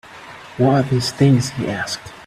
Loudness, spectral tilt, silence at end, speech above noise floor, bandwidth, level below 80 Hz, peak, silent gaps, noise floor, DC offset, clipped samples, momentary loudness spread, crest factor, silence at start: -18 LUFS; -6 dB/octave; 0 s; 21 dB; 13.5 kHz; -50 dBFS; -2 dBFS; none; -38 dBFS; under 0.1%; under 0.1%; 20 LU; 16 dB; 0.1 s